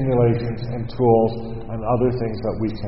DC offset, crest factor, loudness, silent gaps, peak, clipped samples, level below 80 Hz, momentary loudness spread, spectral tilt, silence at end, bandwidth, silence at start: 2%; 18 dB; -21 LUFS; none; -2 dBFS; under 0.1%; -38 dBFS; 11 LU; -8.5 dB/octave; 0 s; 5.8 kHz; 0 s